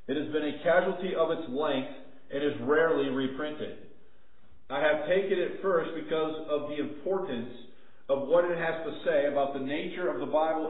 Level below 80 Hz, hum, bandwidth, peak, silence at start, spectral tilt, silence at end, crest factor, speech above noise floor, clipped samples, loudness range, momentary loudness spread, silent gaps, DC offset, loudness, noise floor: -66 dBFS; none; 4.1 kHz; -10 dBFS; 0.1 s; -9.5 dB/octave; 0 s; 20 dB; 35 dB; under 0.1%; 2 LU; 11 LU; none; 0.7%; -30 LUFS; -64 dBFS